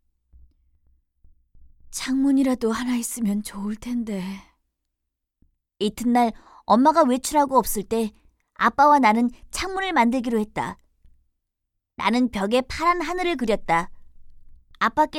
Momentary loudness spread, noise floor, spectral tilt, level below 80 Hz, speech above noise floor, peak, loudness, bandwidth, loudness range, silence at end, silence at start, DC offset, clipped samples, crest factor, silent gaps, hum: 13 LU; -81 dBFS; -4.5 dB/octave; -48 dBFS; 60 dB; -6 dBFS; -22 LUFS; 16.5 kHz; 7 LU; 0 s; 1.9 s; under 0.1%; under 0.1%; 18 dB; none; none